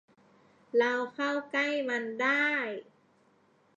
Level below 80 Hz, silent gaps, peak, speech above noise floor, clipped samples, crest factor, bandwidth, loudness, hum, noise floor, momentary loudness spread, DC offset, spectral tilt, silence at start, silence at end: -88 dBFS; none; -16 dBFS; 36 dB; under 0.1%; 18 dB; 7.8 kHz; -29 LUFS; none; -66 dBFS; 6 LU; under 0.1%; -3.5 dB/octave; 0.75 s; 0.95 s